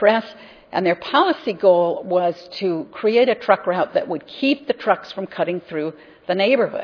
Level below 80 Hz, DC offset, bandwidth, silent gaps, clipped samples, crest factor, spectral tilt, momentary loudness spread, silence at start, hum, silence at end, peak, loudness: -68 dBFS; under 0.1%; 5.4 kHz; none; under 0.1%; 20 dB; -7 dB/octave; 11 LU; 0 s; none; 0 s; 0 dBFS; -20 LUFS